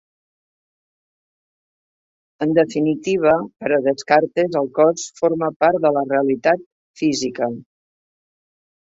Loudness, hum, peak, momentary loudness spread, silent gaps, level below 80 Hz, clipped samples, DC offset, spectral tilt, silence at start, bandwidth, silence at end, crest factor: -19 LUFS; none; -2 dBFS; 6 LU; 5.56-5.60 s, 6.66-6.94 s; -64 dBFS; under 0.1%; under 0.1%; -5 dB/octave; 2.4 s; 8 kHz; 1.35 s; 18 dB